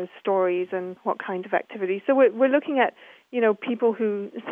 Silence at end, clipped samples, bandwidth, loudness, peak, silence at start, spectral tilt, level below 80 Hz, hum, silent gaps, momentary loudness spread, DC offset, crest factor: 0 s; under 0.1%; 3.7 kHz; -24 LUFS; -6 dBFS; 0 s; -8 dB/octave; -84 dBFS; none; none; 10 LU; under 0.1%; 18 dB